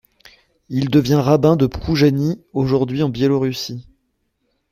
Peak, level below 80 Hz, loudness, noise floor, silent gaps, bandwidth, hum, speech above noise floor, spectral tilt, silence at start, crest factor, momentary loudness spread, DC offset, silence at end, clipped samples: -2 dBFS; -42 dBFS; -17 LUFS; -69 dBFS; none; 15.5 kHz; none; 52 dB; -7 dB/octave; 0.7 s; 16 dB; 11 LU; under 0.1%; 0.9 s; under 0.1%